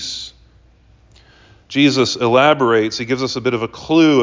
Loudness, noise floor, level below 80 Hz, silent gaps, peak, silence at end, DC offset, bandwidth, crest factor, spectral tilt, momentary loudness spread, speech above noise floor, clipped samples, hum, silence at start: -16 LUFS; -50 dBFS; -52 dBFS; none; -2 dBFS; 0 s; under 0.1%; 7.6 kHz; 16 dB; -5 dB/octave; 12 LU; 35 dB; under 0.1%; none; 0 s